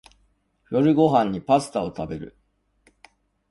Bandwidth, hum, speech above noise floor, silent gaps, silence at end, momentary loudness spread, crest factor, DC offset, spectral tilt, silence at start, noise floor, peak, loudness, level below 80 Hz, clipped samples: 11.5 kHz; none; 45 dB; none; 1.25 s; 15 LU; 20 dB; under 0.1%; -7 dB/octave; 0.7 s; -66 dBFS; -4 dBFS; -22 LUFS; -54 dBFS; under 0.1%